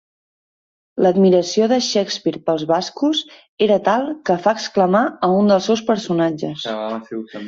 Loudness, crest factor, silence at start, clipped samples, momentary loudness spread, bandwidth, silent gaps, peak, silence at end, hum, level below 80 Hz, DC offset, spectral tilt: -18 LUFS; 16 dB; 0.95 s; under 0.1%; 10 LU; 7.8 kHz; 3.49-3.57 s; -2 dBFS; 0 s; none; -62 dBFS; under 0.1%; -5.5 dB/octave